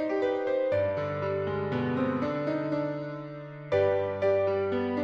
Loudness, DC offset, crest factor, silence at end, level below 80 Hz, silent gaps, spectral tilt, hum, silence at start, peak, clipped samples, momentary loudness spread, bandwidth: -29 LUFS; under 0.1%; 14 dB; 0 s; -64 dBFS; none; -8.5 dB/octave; none; 0 s; -14 dBFS; under 0.1%; 8 LU; 7 kHz